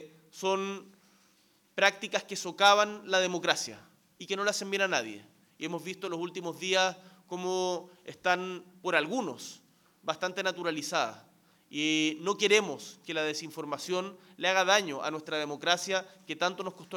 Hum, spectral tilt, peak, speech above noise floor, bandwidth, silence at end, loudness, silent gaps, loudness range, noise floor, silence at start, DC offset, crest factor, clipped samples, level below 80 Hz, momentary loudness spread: none; -2.5 dB/octave; -8 dBFS; 36 dB; 19 kHz; 0 s; -30 LUFS; none; 5 LU; -67 dBFS; 0 s; under 0.1%; 24 dB; under 0.1%; -82 dBFS; 16 LU